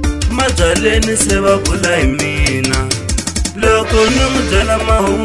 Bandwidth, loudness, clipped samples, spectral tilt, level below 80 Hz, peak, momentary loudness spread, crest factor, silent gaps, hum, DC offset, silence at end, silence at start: 12 kHz; -13 LUFS; under 0.1%; -4 dB/octave; -20 dBFS; 0 dBFS; 5 LU; 12 dB; none; none; 0.6%; 0 s; 0 s